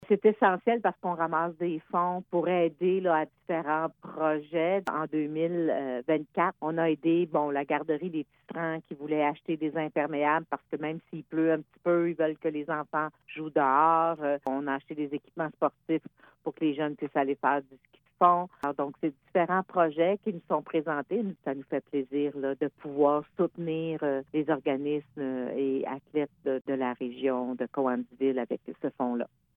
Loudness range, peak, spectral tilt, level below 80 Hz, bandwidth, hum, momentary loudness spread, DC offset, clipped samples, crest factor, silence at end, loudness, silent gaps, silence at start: 3 LU; -8 dBFS; -9 dB/octave; -78 dBFS; 4.1 kHz; none; 9 LU; under 0.1%; under 0.1%; 20 dB; 0.3 s; -29 LUFS; none; 0 s